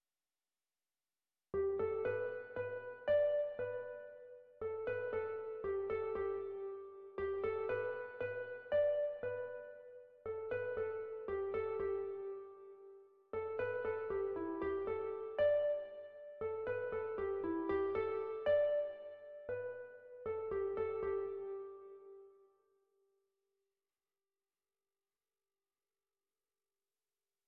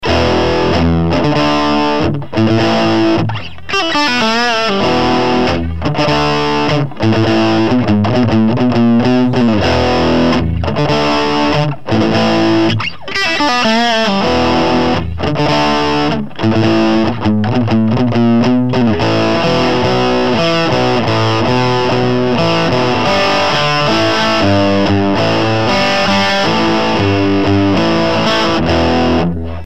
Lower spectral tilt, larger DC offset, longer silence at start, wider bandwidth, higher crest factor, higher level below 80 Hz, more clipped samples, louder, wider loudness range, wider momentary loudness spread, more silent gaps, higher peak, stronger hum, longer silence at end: about the same, -5 dB/octave vs -6 dB/octave; second, under 0.1% vs 5%; first, 1.55 s vs 0 s; second, 4.7 kHz vs 12.5 kHz; about the same, 16 dB vs 12 dB; second, -68 dBFS vs -34 dBFS; neither; second, -40 LUFS vs -12 LUFS; first, 5 LU vs 1 LU; first, 17 LU vs 4 LU; neither; second, -24 dBFS vs 0 dBFS; neither; first, 5.15 s vs 0 s